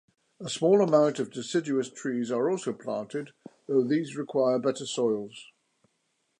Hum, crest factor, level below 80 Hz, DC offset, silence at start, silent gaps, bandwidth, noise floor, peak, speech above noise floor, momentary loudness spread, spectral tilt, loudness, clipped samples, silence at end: none; 20 dB; -80 dBFS; under 0.1%; 0.4 s; none; 11 kHz; -76 dBFS; -8 dBFS; 48 dB; 14 LU; -5.5 dB/octave; -28 LUFS; under 0.1%; 0.95 s